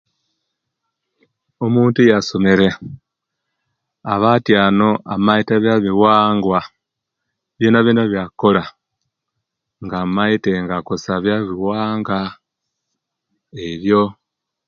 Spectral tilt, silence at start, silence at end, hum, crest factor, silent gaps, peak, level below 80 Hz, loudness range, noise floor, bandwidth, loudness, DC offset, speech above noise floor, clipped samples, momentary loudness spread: -7 dB/octave; 1.6 s; 0.55 s; none; 18 dB; none; 0 dBFS; -50 dBFS; 6 LU; -79 dBFS; 7.2 kHz; -16 LUFS; under 0.1%; 64 dB; under 0.1%; 11 LU